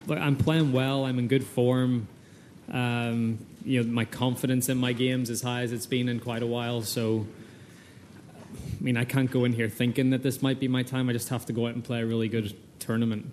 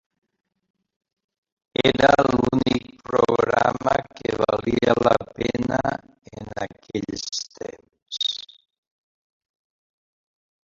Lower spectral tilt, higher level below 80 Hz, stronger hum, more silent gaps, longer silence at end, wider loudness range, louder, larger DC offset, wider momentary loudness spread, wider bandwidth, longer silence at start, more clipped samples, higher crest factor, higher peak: about the same, -6 dB/octave vs -5 dB/octave; second, -58 dBFS vs -50 dBFS; neither; second, none vs 8.02-8.06 s; second, 0 s vs 2.25 s; second, 4 LU vs 11 LU; second, -28 LUFS vs -22 LUFS; neither; second, 10 LU vs 16 LU; first, 14.5 kHz vs 7.8 kHz; second, 0 s vs 1.8 s; neither; about the same, 18 dB vs 22 dB; second, -10 dBFS vs -2 dBFS